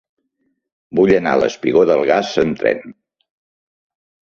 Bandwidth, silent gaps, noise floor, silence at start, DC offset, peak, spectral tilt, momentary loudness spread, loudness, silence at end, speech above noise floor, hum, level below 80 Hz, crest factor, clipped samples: 7.2 kHz; none; -69 dBFS; 0.95 s; under 0.1%; -2 dBFS; -6 dB/octave; 6 LU; -16 LUFS; 1.4 s; 54 dB; none; -54 dBFS; 16 dB; under 0.1%